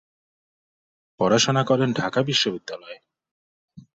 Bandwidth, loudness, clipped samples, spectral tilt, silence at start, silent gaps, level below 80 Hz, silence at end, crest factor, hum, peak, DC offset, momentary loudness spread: 7.8 kHz; -21 LUFS; under 0.1%; -4 dB/octave; 1.2 s; 3.31-3.68 s; -62 dBFS; 0.15 s; 18 dB; none; -6 dBFS; under 0.1%; 17 LU